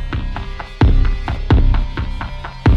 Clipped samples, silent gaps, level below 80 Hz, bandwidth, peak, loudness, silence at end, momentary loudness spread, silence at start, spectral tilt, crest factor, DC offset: under 0.1%; none; -16 dBFS; 6.2 kHz; -2 dBFS; -19 LUFS; 0 s; 13 LU; 0 s; -8 dB/octave; 14 dB; under 0.1%